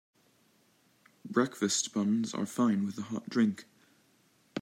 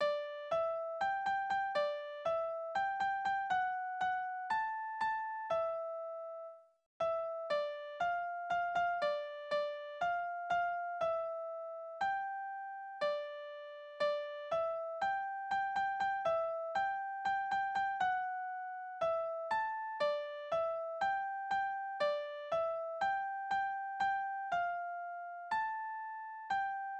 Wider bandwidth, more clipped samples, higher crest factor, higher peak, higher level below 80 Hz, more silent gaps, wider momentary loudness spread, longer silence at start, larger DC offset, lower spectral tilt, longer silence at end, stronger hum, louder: first, 16 kHz vs 9 kHz; neither; about the same, 18 dB vs 14 dB; first, -14 dBFS vs -24 dBFS; about the same, -80 dBFS vs -76 dBFS; second, none vs 6.86-7.00 s; first, 11 LU vs 8 LU; first, 1.25 s vs 0 s; neither; first, -4.5 dB/octave vs -3 dB/octave; about the same, 0 s vs 0 s; neither; first, -31 LUFS vs -37 LUFS